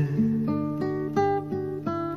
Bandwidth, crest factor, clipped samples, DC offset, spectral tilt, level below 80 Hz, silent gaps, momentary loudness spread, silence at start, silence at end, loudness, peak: 6.8 kHz; 16 dB; under 0.1%; 0.2%; -9 dB/octave; -60 dBFS; none; 5 LU; 0 s; 0 s; -27 LUFS; -12 dBFS